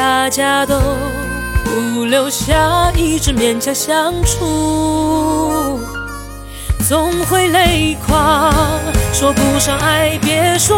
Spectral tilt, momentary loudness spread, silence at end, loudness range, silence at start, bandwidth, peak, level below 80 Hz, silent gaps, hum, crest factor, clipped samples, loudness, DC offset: -4 dB/octave; 8 LU; 0 s; 3 LU; 0 s; 16.5 kHz; 0 dBFS; -24 dBFS; none; none; 14 dB; under 0.1%; -14 LUFS; under 0.1%